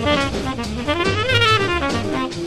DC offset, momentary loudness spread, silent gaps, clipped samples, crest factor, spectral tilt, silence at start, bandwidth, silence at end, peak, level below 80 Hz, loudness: under 0.1%; 10 LU; none; under 0.1%; 16 dB; -4.5 dB/octave; 0 s; 13 kHz; 0 s; -2 dBFS; -36 dBFS; -19 LUFS